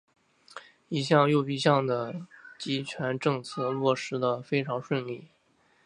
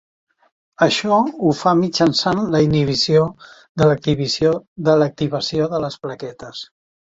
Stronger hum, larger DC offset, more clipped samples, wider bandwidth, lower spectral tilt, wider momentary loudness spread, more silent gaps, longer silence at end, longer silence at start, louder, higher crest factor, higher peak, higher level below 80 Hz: neither; neither; neither; first, 11 kHz vs 7.8 kHz; about the same, -6 dB/octave vs -5.5 dB/octave; first, 19 LU vs 15 LU; second, none vs 3.69-3.75 s, 4.68-4.76 s; first, 0.6 s vs 0.35 s; second, 0.55 s vs 0.8 s; second, -28 LUFS vs -17 LUFS; first, 22 dB vs 16 dB; second, -6 dBFS vs -2 dBFS; second, -74 dBFS vs -50 dBFS